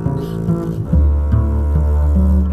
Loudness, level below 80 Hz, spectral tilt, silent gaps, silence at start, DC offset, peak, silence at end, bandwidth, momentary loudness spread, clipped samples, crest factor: -16 LUFS; -16 dBFS; -10.5 dB/octave; none; 0 s; under 0.1%; -2 dBFS; 0 s; 3.2 kHz; 5 LU; under 0.1%; 12 dB